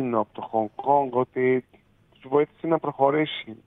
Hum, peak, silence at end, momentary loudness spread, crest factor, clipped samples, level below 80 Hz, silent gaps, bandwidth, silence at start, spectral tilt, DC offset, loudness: none; -6 dBFS; 0.1 s; 6 LU; 18 dB; under 0.1%; -68 dBFS; none; 4 kHz; 0 s; -9 dB/octave; under 0.1%; -24 LUFS